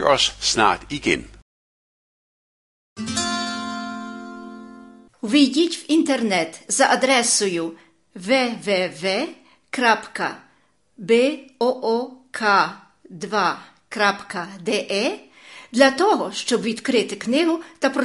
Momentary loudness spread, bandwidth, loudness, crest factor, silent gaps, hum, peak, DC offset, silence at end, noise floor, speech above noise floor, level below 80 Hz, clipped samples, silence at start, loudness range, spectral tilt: 16 LU; 11.5 kHz; -20 LUFS; 20 dB; 1.42-2.96 s; none; -2 dBFS; under 0.1%; 0 s; -62 dBFS; 41 dB; -54 dBFS; under 0.1%; 0 s; 8 LU; -2.5 dB/octave